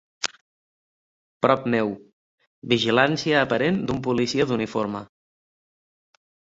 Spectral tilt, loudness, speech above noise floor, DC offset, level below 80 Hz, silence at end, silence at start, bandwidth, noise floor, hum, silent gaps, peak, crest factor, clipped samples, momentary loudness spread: -5 dB/octave; -23 LUFS; over 68 dB; under 0.1%; -58 dBFS; 1.55 s; 0.2 s; 8 kHz; under -90 dBFS; none; 0.41-1.41 s, 2.13-2.38 s, 2.47-2.62 s; -2 dBFS; 24 dB; under 0.1%; 11 LU